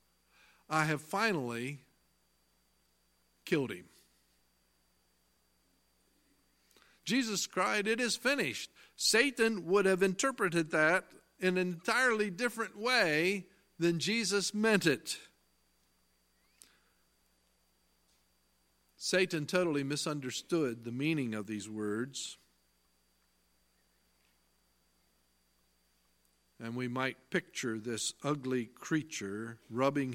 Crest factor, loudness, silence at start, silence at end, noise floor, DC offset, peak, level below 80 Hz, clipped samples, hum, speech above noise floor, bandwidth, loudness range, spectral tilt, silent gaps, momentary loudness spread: 24 dB; -33 LUFS; 0.7 s; 0 s; -74 dBFS; under 0.1%; -12 dBFS; -76 dBFS; under 0.1%; 60 Hz at -65 dBFS; 41 dB; 16.5 kHz; 13 LU; -3.5 dB/octave; none; 12 LU